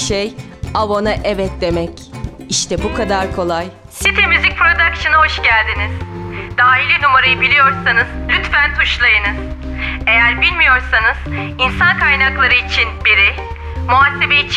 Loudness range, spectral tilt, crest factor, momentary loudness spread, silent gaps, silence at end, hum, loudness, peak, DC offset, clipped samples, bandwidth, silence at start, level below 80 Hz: 6 LU; -3.5 dB/octave; 14 dB; 14 LU; none; 0 s; none; -12 LUFS; 0 dBFS; under 0.1%; under 0.1%; 14 kHz; 0 s; -28 dBFS